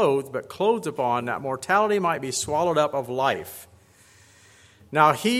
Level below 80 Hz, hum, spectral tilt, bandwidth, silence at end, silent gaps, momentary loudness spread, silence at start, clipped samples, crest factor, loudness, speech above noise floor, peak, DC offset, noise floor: -64 dBFS; none; -4 dB/octave; 16.5 kHz; 0 s; none; 9 LU; 0 s; under 0.1%; 22 dB; -24 LUFS; 31 dB; -2 dBFS; under 0.1%; -55 dBFS